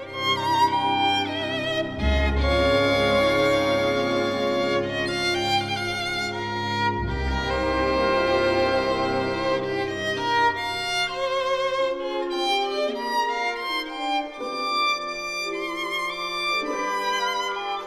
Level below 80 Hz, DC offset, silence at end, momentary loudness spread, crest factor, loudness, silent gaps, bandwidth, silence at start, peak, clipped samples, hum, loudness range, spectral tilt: -36 dBFS; under 0.1%; 0 s; 6 LU; 16 dB; -24 LUFS; none; 15 kHz; 0 s; -8 dBFS; under 0.1%; none; 4 LU; -4.5 dB/octave